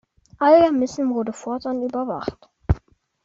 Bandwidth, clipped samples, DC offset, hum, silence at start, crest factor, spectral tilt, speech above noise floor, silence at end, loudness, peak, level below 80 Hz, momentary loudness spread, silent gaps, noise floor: 7.8 kHz; under 0.1%; under 0.1%; none; 0.4 s; 18 dB; -7 dB/octave; 31 dB; 0.45 s; -21 LUFS; -4 dBFS; -38 dBFS; 14 LU; none; -51 dBFS